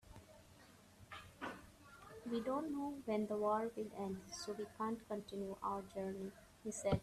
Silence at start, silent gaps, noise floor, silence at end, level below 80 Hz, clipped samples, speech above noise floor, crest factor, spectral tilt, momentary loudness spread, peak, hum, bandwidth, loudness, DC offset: 0.05 s; none; -64 dBFS; 0 s; -68 dBFS; under 0.1%; 22 dB; 20 dB; -5.5 dB/octave; 22 LU; -24 dBFS; none; 14.5 kHz; -44 LUFS; under 0.1%